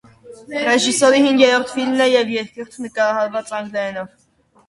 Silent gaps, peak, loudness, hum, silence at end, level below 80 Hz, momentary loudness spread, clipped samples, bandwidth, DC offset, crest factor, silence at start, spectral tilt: none; 0 dBFS; -17 LUFS; none; 0.6 s; -62 dBFS; 16 LU; under 0.1%; 11.5 kHz; under 0.1%; 18 dB; 0.25 s; -2.5 dB/octave